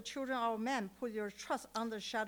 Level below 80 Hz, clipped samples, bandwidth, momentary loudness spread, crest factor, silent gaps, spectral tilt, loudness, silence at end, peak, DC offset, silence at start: -74 dBFS; under 0.1%; over 20 kHz; 5 LU; 16 dB; none; -3.5 dB/octave; -39 LUFS; 0 s; -24 dBFS; under 0.1%; 0 s